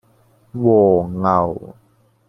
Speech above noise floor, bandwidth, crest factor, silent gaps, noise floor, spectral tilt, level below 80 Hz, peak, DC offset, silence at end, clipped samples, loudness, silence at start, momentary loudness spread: 39 dB; 6 kHz; 16 dB; none; -55 dBFS; -11 dB/octave; -52 dBFS; -2 dBFS; under 0.1%; 0.55 s; under 0.1%; -16 LUFS; 0.55 s; 16 LU